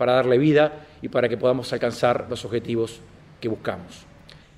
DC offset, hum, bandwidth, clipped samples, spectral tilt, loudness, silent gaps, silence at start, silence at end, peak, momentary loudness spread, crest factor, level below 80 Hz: under 0.1%; none; 12.5 kHz; under 0.1%; -6.5 dB/octave; -23 LUFS; none; 0 s; 0.6 s; -6 dBFS; 14 LU; 16 dB; -56 dBFS